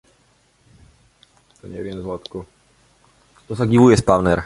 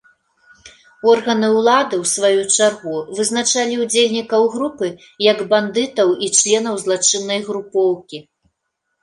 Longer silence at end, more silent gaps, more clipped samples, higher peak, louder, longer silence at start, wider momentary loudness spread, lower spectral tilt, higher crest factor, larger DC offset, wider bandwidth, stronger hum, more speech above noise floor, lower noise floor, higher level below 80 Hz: second, 0 s vs 0.8 s; neither; neither; about the same, -2 dBFS vs -2 dBFS; about the same, -17 LUFS vs -16 LUFS; first, 1.65 s vs 0.65 s; first, 22 LU vs 9 LU; first, -7 dB/octave vs -2 dB/octave; about the same, 20 dB vs 16 dB; neither; about the same, 11.5 kHz vs 11.5 kHz; neither; second, 42 dB vs 57 dB; second, -59 dBFS vs -74 dBFS; first, -42 dBFS vs -64 dBFS